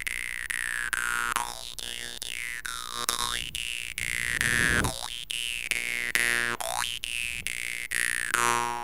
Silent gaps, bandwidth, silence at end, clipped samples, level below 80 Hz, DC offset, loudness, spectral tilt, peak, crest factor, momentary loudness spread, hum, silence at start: none; 17 kHz; 0 s; under 0.1%; -48 dBFS; 0.5%; -28 LUFS; -1 dB/octave; 0 dBFS; 30 dB; 9 LU; none; 0 s